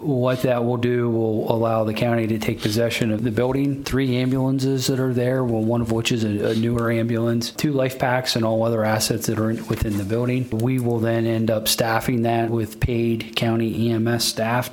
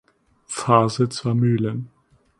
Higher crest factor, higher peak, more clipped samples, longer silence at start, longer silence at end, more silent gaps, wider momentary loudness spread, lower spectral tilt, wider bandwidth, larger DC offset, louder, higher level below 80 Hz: about the same, 20 dB vs 20 dB; about the same, 0 dBFS vs -2 dBFS; neither; second, 0 s vs 0.5 s; second, 0 s vs 0.5 s; neither; second, 3 LU vs 15 LU; about the same, -5.5 dB/octave vs -6.5 dB/octave; first, 18.5 kHz vs 11.5 kHz; neither; about the same, -21 LUFS vs -20 LUFS; first, -44 dBFS vs -58 dBFS